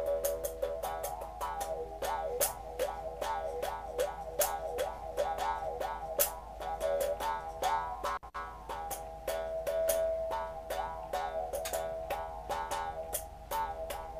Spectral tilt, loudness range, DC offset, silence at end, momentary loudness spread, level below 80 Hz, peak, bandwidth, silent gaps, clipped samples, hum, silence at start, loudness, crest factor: -2.5 dB/octave; 2 LU; under 0.1%; 0 s; 7 LU; -52 dBFS; -12 dBFS; 15.5 kHz; none; under 0.1%; none; 0 s; -36 LUFS; 24 dB